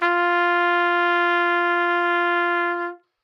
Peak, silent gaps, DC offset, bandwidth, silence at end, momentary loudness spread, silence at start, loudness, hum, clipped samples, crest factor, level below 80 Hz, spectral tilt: -6 dBFS; none; under 0.1%; 6.6 kHz; 0.3 s; 4 LU; 0 s; -20 LUFS; none; under 0.1%; 14 dB; under -90 dBFS; -2 dB/octave